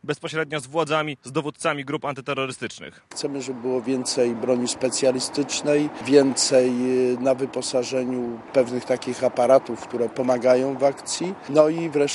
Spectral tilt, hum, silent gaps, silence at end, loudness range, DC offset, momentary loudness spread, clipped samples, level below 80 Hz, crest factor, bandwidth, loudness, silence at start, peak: -4 dB/octave; none; none; 0 s; 6 LU; under 0.1%; 10 LU; under 0.1%; -66 dBFS; 20 dB; 12 kHz; -23 LUFS; 0.05 s; -2 dBFS